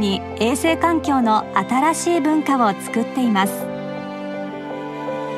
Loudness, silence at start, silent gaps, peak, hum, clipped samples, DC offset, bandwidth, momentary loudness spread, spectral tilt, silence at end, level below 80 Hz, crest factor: -20 LUFS; 0 s; none; -4 dBFS; none; under 0.1%; under 0.1%; 15.5 kHz; 11 LU; -4.5 dB/octave; 0 s; -52 dBFS; 16 dB